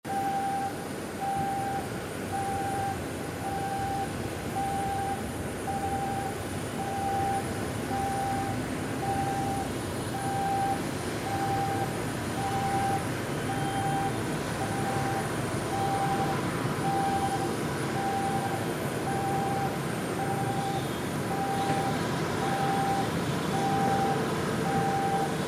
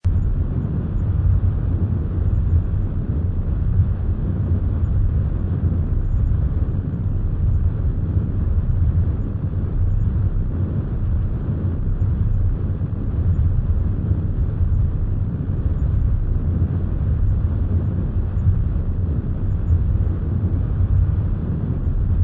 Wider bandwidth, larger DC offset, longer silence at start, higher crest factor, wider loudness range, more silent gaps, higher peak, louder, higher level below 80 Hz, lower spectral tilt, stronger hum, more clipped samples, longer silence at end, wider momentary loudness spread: first, 16.5 kHz vs 2.7 kHz; second, under 0.1% vs 0.2%; about the same, 0.05 s vs 0.05 s; about the same, 14 dB vs 12 dB; first, 4 LU vs 1 LU; neither; second, -16 dBFS vs -6 dBFS; second, -30 LUFS vs -22 LUFS; second, -52 dBFS vs -22 dBFS; second, -5 dB/octave vs -12.5 dB/octave; neither; neither; about the same, 0 s vs 0 s; about the same, 5 LU vs 4 LU